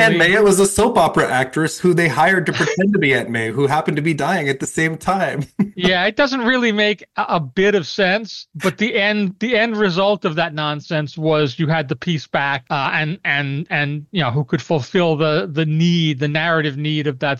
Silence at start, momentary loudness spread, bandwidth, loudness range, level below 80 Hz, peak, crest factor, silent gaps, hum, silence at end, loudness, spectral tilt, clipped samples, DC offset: 0 s; 6 LU; 12.5 kHz; 3 LU; -50 dBFS; -6 dBFS; 12 dB; none; none; 0 s; -17 LUFS; -5 dB/octave; under 0.1%; under 0.1%